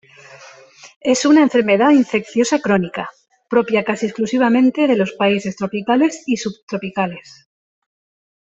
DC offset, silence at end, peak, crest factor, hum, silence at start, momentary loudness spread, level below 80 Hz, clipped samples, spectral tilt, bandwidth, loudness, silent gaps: under 0.1%; 1.2 s; -2 dBFS; 14 dB; none; 0.3 s; 12 LU; -60 dBFS; under 0.1%; -5 dB/octave; 8.2 kHz; -17 LUFS; 0.96-1.01 s, 6.63-6.68 s